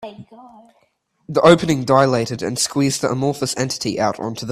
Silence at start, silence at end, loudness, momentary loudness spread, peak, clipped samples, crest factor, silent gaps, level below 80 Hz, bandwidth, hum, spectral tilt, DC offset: 0 s; 0 s; -18 LUFS; 10 LU; 0 dBFS; under 0.1%; 18 dB; none; -52 dBFS; 15 kHz; none; -4.5 dB/octave; under 0.1%